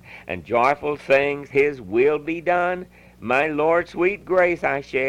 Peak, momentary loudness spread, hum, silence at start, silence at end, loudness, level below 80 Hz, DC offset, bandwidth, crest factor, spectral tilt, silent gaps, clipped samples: -6 dBFS; 6 LU; 60 Hz at -50 dBFS; 0.05 s; 0 s; -21 LUFS; -54 dBFS; under 0.1%; 11.5 kHz; 16 dB; -6.5 dB/octave; none; under 0.1%